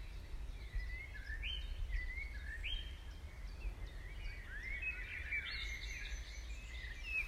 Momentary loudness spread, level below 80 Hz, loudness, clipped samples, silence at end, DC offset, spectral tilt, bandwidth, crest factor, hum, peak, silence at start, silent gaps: 10 LU; -46 dBFS; -46 LUFS; under 0.1%; 0 s; under 0.1%; -3 dB/octave; 14 kHz; 14 dB; none; -30 dBFS; 0 s; none